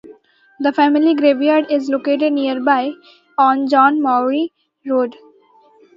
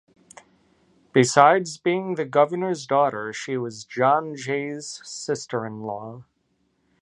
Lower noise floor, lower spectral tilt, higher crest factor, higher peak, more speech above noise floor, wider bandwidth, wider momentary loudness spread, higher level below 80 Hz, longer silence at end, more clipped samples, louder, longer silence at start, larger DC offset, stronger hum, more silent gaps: second, -51 dBFS vs -69 dBFS; about the same, -5 dB/octave vs -4.5 dB/octave; second, 16 dB vs 24 dB; about the same, -2 dBFS vs 0 dBFS; second, 36 dB vs 47 dB; second, 7.4 kHz vs 11.5 kHz; second, 10 LU vs 16 LU; about the same, -72 dBFS vs -72 dBFS; about the same, 0.85 s vs 0.8 s; neither; first, -16 LUFS vs -23 LUFS; second, 0.1 s vs 1.15 s; neither; neither; neither